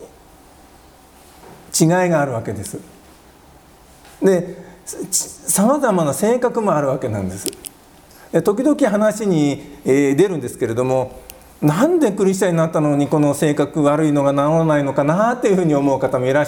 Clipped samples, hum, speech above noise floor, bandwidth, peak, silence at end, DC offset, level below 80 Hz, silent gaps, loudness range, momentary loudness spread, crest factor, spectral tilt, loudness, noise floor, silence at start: under 0.1%; none; 30 dB; 19.5 kHz; 0 dBFS; 0 s; under 0.1%; -52 dBFS; none; 6 LU; 11 LU; 16 dB; -5.5 dB/octave; -17 LUFS; -46 dBFS; 0 s